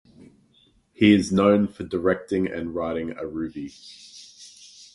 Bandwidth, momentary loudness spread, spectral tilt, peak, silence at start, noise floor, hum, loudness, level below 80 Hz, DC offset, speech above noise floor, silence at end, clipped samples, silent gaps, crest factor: 11.5 kHz; 25 LU; -6 dB/octave; -4 dBFS; 0.2 s; -61 dBFS; none; -23 LUFS; -52 dBFS; under 0.1%; 38 dB; 0.1 s; under 0.1%; none; 20 dB